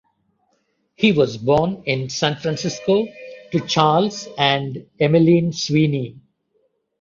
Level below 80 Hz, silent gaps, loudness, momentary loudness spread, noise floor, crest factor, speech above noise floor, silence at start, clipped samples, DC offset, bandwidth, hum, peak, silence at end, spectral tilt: -54 dBFS; none; -19 LUFS; 9 LU; -67 dBFS; 18 dB; 49 dB; 1 s; under 0.1%; under 0.1%; 7.6 kHz; none; -2 dBFS; 0.8 s; -5.5 dB/octave